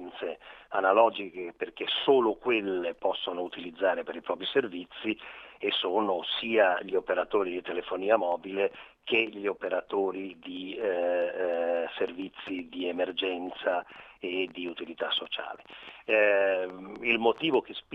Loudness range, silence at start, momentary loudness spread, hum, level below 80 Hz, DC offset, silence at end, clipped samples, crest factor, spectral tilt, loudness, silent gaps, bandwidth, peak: 5 LU; 0 s; 13 LU; none; -70 dBFS; under 0.1%; 0 s; under 0.1%; 22 dB; -6 dB/octave; -29 LUFS; none; 5.8 kHz; -8 dBFS